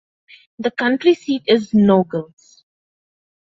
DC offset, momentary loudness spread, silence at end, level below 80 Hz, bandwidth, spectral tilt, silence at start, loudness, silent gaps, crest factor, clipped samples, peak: under 0.1%; 11 LU; 1.25 s; -58 dBFS; 7.6 kHz; -7 dB/octave; 0.6 s; -17 LUFS; none; 16 dB; under 0.1%; -2 dBFS